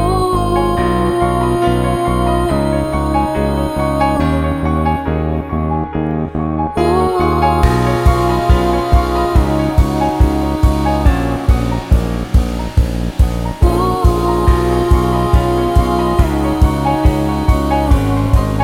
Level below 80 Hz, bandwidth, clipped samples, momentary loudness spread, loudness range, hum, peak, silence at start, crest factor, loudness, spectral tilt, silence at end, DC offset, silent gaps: -18 dBFS; 15.5 kHz; under 0.1%; 4 LU; 3 LU; none; 0 dBFS; 0 s; 12 dB; -15 LUFS; -7.5 dB/octave; 0 s; under 0.1%; none